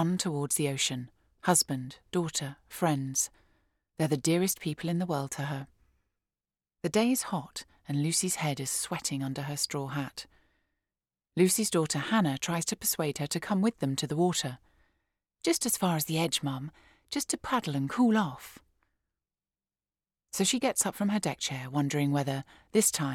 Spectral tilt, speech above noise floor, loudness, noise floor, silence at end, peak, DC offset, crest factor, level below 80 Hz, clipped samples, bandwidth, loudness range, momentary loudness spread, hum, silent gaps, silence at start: -4 dB/octave; over 60 dB; -30 LUFS; under -90 dBFS; 0 s; -10 dBFS; under 0.1%; 20 dB; -66 dBFS; under 0.1%; 18 kHz; 3 LU; 12 LU; none; none; 0 s